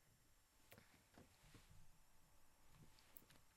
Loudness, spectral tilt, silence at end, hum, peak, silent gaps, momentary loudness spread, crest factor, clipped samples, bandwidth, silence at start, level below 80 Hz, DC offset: -68 LUFS; -3.5 dB/octave; 0 s; none; -38 dBFS; none; 4 LU; 30 dB; under 0.1%; 13 kHz; 0 s; -76 dBFS; under 0.1%